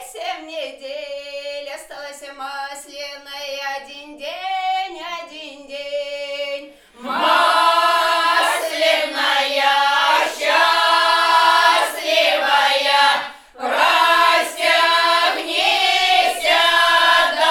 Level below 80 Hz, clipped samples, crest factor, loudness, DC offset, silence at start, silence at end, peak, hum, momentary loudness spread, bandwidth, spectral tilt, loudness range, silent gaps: -60 dBFS; under 0.1%; 16 dB; -15 LUFS; under 0.1%; 0 s; 0 s; -2 dBFS; none; 18 LU; 18.5 kHz; 1 dB/octave; 15 LU; none